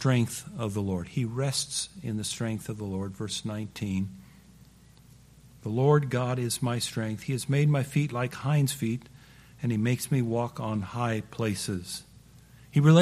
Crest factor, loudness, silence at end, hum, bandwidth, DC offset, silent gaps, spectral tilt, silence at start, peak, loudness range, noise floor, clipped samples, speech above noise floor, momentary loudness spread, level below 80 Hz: 20 dB; -29 LUFS; 0 s; none; 15 kHz; under 0.1%; none; -5.5 dB/octave; 0 s; -8 dBFS; 7 LU; -55 dBFS; under 0.1%; 27 dB; 10 LU; -60 dBFS